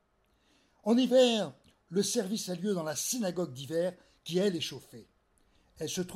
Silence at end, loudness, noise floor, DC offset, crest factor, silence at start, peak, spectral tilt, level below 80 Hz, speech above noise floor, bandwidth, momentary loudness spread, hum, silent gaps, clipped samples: 0 s; -31 LUFS; -71 dBFS; under 0.1%; 18 dB; 0.85 s; -14 dBFS; -4 dB/octave; -72 dBFS; 41 dB; 16 kHz; 14 LU; none; none; under 0.1%